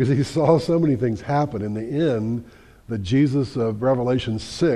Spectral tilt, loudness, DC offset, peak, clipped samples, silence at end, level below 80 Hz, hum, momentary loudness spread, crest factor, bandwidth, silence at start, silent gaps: -7.5 dB/octave; -22 LUFS; under 0.1%; -4 dBFS; under 0.1%; 0 s; -48 dBFS; none; 9 LU; 18 dB; 11.5 kHz; 0 s; none